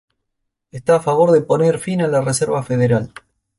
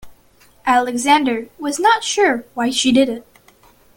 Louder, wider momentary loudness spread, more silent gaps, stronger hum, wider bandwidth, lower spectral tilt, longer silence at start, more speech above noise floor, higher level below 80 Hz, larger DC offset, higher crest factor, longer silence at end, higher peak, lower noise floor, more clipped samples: about the same, -17 LUFS vs -17 LUFS; about the same, 9 LU vs 9 LU; neither; neither; second, 11.5 kHz vs 17 kHz; first, -6 dB/octave vs -2 dB/octave; first, 0.75 s vs 0.05 s; first, 59 dB vs 35 dB; about the same, -54 dBFS vs -54 dBFS; neither; about the same, 14 dB vs 16 dB; second, 0.5 s vs 0.75 s; about the same, -2 dBFS vs -2 dBFS; first, -75 dBFS vs -51 dBFS; neither